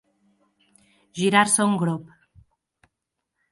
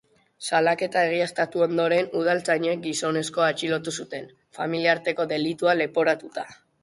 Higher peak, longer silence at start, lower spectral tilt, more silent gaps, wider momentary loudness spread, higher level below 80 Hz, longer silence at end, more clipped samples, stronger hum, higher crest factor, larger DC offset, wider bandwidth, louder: first, -4 dBFS vs -8 dBFS; first, 1.15 s vs 0.4 s; about the same, -3.5 dB/octave vs -4 dB/octave; neither; first, 15 LU vs 12 LU; about the same, -66 dBFS vs -70 dBFS; first, 1.5 s vs 0.3 s; neither; neither; about the same, 22 dB vs 18 dB; neither; about the same, 11.5 kHz vs 11.5 kHz; first, -21 LUFS vs -24 LUFS